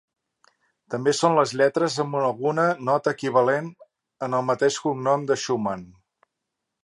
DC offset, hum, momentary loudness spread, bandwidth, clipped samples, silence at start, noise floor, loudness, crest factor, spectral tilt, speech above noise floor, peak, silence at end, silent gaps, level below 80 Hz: under 0.1%; none; 8 LU; 11.5 kHz; under 0.1%; 0.9 s; -82 dBFS; -23 LUFS; 20 dB; -5 dB/octave; 60 dB; -4 dBFS; 1 s; none; -68 dBFS